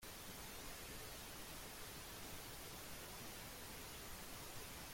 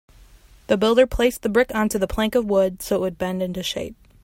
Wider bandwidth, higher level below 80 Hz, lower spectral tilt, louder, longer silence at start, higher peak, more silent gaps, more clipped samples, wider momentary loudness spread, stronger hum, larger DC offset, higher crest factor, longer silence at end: about the same, 16.5 kHz vs 16.5 kHz; second, -62 dBFS vs -40 dBFS; second, -2.5 dB/octave vs -5 dB/octave; second, -52 LUFS vs -21 LUFS; second, 0 s vs 0.7 s; second, -38 dBFS vs -4 dBFS; neither; neither; second, 0 LU vs 9 LU; neither; neither; about the same, 14 dB vs 18 dB; second, 0 s vs 0.3 s